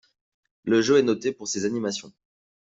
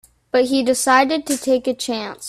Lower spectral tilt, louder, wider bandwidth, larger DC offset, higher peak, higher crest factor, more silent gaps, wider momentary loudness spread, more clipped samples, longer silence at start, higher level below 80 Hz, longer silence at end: first, -4 dB/octave vs -2 dB/octave; second, -24 LUFS vs -18 LUFS; second, 8 kHz vs 15.5 kHz; neither; second, -8 dBFS vs 0 dBFS; about the same, 18 dB vs 18 dB; neither; first, 13 LU vs 8 LU; neither; first, 0.65 s vs 0.35 s; second, -66 dBFS vs -58 dBFS; first, 0.55 s vs 0 s